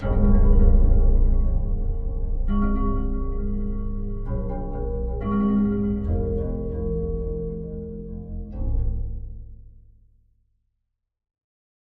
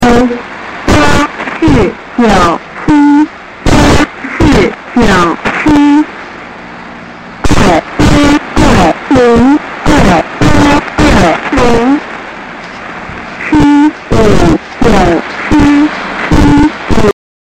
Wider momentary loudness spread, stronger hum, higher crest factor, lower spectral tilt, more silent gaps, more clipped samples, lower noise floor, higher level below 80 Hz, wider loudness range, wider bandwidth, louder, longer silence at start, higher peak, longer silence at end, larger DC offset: about the same, 14 LU vs 16 LU; neither; first, 18 dB vs 8 dB; first, -13 dB/octave vs -6 dB/octave; neither; neither; first, -78 dBFS vs -26 dBFS; about the same, -22 dBFS vs -20 dBFS; first, 11 LU vs 3 LU; second, 2.1 kHz vs 13 kHz; second, -26 LUFS vs -8 LUFS; about the same, 0 s vs 0 s; second, -4 dBFS vs 0 dBFS; first, 2.15 s vs 0.35 s; neither